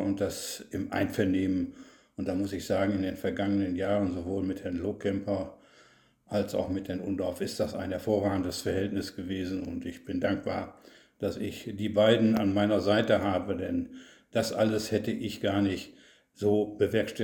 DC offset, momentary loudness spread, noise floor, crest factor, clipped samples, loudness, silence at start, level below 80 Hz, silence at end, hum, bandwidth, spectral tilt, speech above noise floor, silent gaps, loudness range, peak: under 0.1%; 11 LU; -61 dBFS; 20 dB; under 0.1%; -30 LUFS; 0 s; -58 dBFS; 0 s; none; 18 kHz; -6 dB/octave; 32 dB; none; 6 LU; -10 dBFS